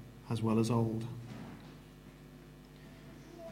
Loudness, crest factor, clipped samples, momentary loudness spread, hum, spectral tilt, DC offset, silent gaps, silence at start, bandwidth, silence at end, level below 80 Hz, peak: -35 LUFS; 18 dB; under 0.1%; 23 LU; none; -7.5 dB/octave; under 0.1%; none; 0 s; 16 kHz; 0 s; -62 dBFS; -20 dBFS